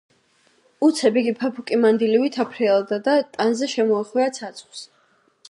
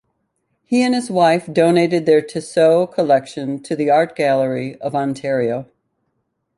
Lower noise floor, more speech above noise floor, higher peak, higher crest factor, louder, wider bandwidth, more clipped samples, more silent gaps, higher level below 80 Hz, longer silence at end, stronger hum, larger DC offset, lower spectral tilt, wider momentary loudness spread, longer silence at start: second, -61 dBFS vs -71 dBFS; second, 41 dB vs 54 dB; second, -6 dBFS vs -2 dBFS; about the same, 16 dB vs 16 dB; second, -20 LUFS vs -17 LUFS; about the same, 11.5 kHz vs 11.5 kHz; neither; neither; second, -78 dBFS vs -64 dBFS; second, 0.65 s vs 0.95 s; neither; neither; second, -4.5 dB/octave vs -6 dB/octave; first, 15 LU vs 9 LU; about the same, 0.8 s vs 0.7 s